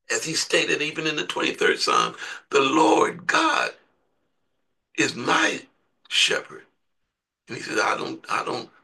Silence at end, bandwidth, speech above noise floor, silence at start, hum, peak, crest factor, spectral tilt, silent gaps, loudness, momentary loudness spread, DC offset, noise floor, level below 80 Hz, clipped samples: 0.2 s; 12.5 kHz; 56 dB; 0.1 s; none; -4 dBFS; 20 dB; -2 dB/octave; none; -22 LUFS; 10 LU; under 0.1%; -79 dBFS; -74 dBFS; under 0.1%